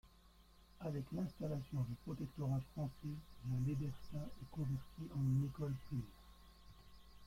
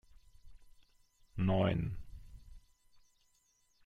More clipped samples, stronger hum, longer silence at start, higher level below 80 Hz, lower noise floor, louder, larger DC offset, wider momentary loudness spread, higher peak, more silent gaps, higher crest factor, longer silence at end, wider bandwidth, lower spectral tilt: neither; neither; second, 0.05 s vs 0.45 s; second, -62 dBFS vs -54 dBFS; second, -66 dBFS vs -74 dBFS; second, -44 LUFS vs -35 LUFS; neither; about the same, 24 LU vs 24 LU; second, -28 dBFS vs -18 dBFS; neither; second, 16 dB vs 22 dB; second, 0 s vs 1.25 s; first, 15.5 kHz vs 7.2 kHz; about the same, -8.5 dB/octave vs -8.5 dB/octave